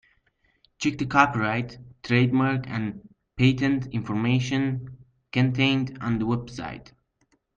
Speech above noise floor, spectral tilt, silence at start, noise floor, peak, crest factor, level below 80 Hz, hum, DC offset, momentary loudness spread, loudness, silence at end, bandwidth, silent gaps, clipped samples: 45 dB; -6.5 dB/octave; 0.8 s; -69 dBFS; -4 dBFS; 22 dB; -54 dBFS; none; under 0.1%; 16 LU; -25 LUFS; 0.75 s; 7.4 kHz; none; under 0.1%